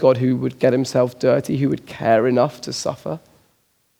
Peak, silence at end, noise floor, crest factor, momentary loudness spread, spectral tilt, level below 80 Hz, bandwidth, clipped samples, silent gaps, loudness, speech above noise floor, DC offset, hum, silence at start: -2 dBFS; 0.8 s; -64 dBFS; 18 dB; 9 LU; -6.5 dB/octave; -60 dBFS; 16 kHz; under 0.1%; none; -19 LUFS; 45 dB; under 0.1%; none; 0 s